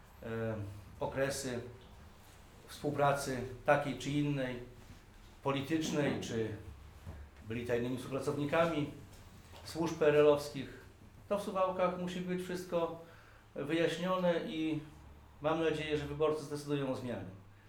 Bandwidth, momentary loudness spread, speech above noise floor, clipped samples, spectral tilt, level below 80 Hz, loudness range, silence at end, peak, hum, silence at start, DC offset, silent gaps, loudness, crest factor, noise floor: 19 kHz; 20 LU; 23 dB; under 0.1%; -5.5 dB/octave; -60 dBFS; 4 LU; 0 s; -16 dBFS; none; 0.05 s; under 0.1%; none; -35 LUFS; 20 dB; -57 dBFS